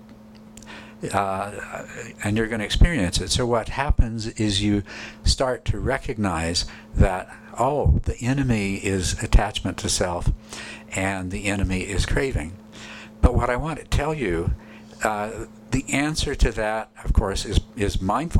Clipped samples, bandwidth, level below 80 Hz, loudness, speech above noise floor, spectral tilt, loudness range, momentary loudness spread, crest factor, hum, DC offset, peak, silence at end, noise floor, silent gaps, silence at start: under 0.1%; 14 kHz; -28 dBFS; -24 LUFS; 22 dB; -5 dB/octave; 3 LU; 13 LU; 16 dB; none; under 0.1%; -6 dBFS; 0 s; -45 dBFS; none; 0 s